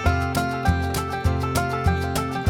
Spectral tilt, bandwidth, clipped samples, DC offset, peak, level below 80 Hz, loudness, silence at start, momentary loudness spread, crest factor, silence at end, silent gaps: -5.5 dB/octave; 17.5 kHz; under 0.1%; under 0.1%; -6 dBFS; -32 dBFS; -23 LUFS; 0 s; 2 LU; 16 dB; 0 s; none